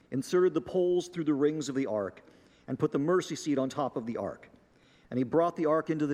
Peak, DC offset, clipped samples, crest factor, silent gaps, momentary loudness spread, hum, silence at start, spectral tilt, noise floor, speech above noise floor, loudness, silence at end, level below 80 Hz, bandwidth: -14 dBFS; under 0.1%; under 0.1%; 16 dB; none; 10 LU; none; 0.1 s; -6.5 dB/octave; -62 dBFS; 33 dB; -30 LUFS; 0 s; -70 dBFS; 14 kHz